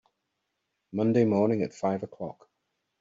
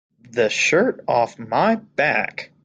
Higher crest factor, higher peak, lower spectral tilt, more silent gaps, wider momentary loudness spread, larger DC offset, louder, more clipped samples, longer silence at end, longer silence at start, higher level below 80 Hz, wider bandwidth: about the same, 18 dB vs 16 dB; second, -12 dBFS vs -4 dBFS; first, -8.5 dB/octave vs -4 dB/octave; neither; first, 16 LU vs 6 LU; neither; second, -27 LUFS vs -20 LUFS; neither; first, 0.7 s vs 0.2 s; first, 0.95 s vs 0.35 s; second, -70 dBFS vs -64 dBFS; second, 7.8 kHz vs 9.4 kHz